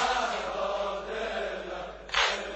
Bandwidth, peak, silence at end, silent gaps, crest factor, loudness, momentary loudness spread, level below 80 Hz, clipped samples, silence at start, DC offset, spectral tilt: 8.4 kHz; -10 dBFS; 0 s; none; 22 dB; -31 LUFS; 10 LU; -52 dBFS; under 0.1%; 0 s; under 0.1%; -1.5 dB/octave